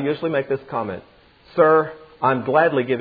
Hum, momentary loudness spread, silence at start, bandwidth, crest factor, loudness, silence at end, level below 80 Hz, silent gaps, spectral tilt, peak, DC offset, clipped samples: none; 14 LU; 0 s; 4.9 kHz; 18 dB; -20 LUFS; 0 s; -60 dBFS; none; -10 dB/octave; -2 dBFS; under 0.1%; under 0.1%